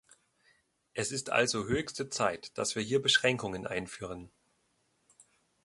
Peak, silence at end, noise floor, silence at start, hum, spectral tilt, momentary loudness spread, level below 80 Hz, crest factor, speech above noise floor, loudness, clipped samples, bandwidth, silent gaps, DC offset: -10 dBFS; 0.45 s; -75 dBFS; 0.95 s; none; -3 dB/octave; 16 LU; -62 dBFS; 24 dB; 43 dB; -31 LUFS; under 0.1%; 11.5 kHz; none; under 0.1%